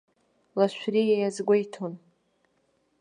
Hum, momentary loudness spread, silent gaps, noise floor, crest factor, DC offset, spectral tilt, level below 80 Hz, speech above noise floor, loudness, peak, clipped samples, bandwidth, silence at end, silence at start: none; 13 LU; none; -70 dBFS; 18 dB; under 0.1%; -6 dB/octave; -80 dBFS; 45 dB; -26 LUFS; -10 dBFS; under 0.1%; 10 kHz; 1.05 s; 0.55 s